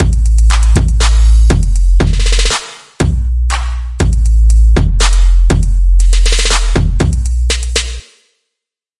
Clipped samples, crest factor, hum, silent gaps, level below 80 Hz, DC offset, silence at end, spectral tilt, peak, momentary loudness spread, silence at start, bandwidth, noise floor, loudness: under 0.1%; 10 dB; none; none; -10 dBFS; under 0.1%; 1 s; -4.5 dB/octave; 0 dBFS; 6 LU; 0 s; 11.5 kHz; -79 dBFS; -12 LUFS